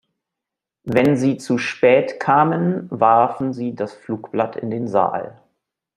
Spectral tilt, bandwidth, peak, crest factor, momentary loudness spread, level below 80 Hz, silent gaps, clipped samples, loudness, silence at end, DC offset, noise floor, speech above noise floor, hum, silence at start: -7 dB/octave; 11.5 kHz; 0 dBFS; 18 dB; 12 LU; -60 dBFS; none; under 0.1%; -19 LUFS; 0.65 s; under 0.1%; -85 dBFS; 67 dB; none; 0.85 s